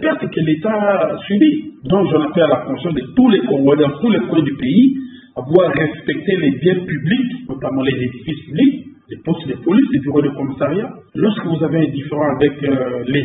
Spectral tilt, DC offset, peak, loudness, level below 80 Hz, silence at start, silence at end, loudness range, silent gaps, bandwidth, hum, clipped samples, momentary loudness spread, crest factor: -11.5 dB/octave; under 0.1%; 0 dBFS; -16 LUFS; -50 dBFS; 0 s; 0 s; 3 LU; none; 4 kHz; none; under 0.1%; 10 LU; 16 dB